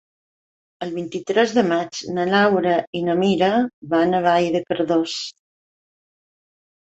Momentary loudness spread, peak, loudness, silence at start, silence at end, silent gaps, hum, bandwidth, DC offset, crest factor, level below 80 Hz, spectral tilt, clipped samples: 11 LU; -4 dBFS; -20 LUFS; 0.8 s; 1.55 s; 2.87-2.93 s, 3.73-3.82 s; none; 8.2 kHz; under 0.1%; 18 dB; -62 dBFS; -5.5 dB/octave; under 0.1%